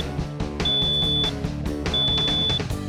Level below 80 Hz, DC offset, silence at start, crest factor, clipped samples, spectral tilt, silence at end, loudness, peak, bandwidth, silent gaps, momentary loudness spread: -34 dBFS; under 0.1%; 0 s; 10 dB; under 0.1%; -4.5 dB/octave; 0 s; -22 LUFS; -14 dBFS; 15.5 kHz; none; 10 LU